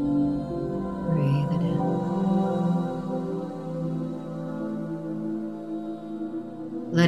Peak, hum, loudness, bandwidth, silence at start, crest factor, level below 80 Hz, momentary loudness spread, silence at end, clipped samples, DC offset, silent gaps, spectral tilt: -6 dBFS; none; -28 LUFS; 8.4 kHz; 0 s; 20 dB; -52 dBFS; 10 LU; 0 s; under 0.1%; 0.2%; none; -8.5 dB/octave